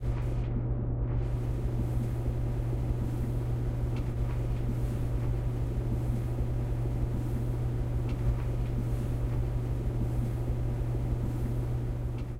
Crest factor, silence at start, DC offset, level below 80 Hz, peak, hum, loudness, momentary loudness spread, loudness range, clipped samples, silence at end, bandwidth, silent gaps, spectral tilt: 12 dB; 0 s; under 0.1%; -34 dBFS; -18 dBFS; none; -32 LUFS; 1 LU; 0 LU; under 0.1%; 0 s; 11 kHz; none; -9 dB/octave